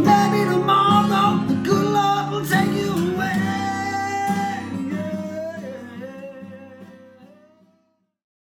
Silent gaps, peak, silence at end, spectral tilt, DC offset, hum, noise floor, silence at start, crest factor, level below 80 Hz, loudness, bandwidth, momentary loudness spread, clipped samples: none; -2 dBFS; 1.25 s; -5.5 dB/octave; under 0.1%; none; -66 dBFS; 0 s; 20 dB; -56 dBFS; -20 LUFS; 18 kHz; 19 LU; under 0.1%